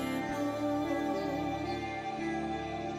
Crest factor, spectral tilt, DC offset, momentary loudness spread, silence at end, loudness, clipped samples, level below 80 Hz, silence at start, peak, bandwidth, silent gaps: 12 dB; -6 dB/octave; under 0.1%; 4 LU; 0 s; -34 LUFS; under 0.1%; -56 dBFS; 0 s; -22 dBFS; 16 kHz; none